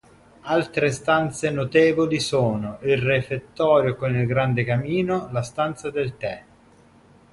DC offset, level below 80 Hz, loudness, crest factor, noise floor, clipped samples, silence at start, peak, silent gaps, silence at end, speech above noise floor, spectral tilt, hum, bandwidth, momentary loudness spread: under 0.1%; -52 dBFS; -22 LUFS; 16 dB; -53 dBFS; under 0.1%; 0.45 s; -6 dBFS; none; 0.9 s; 31 dB; -6 dB/octave; none; 11.5 kHz; 9 LU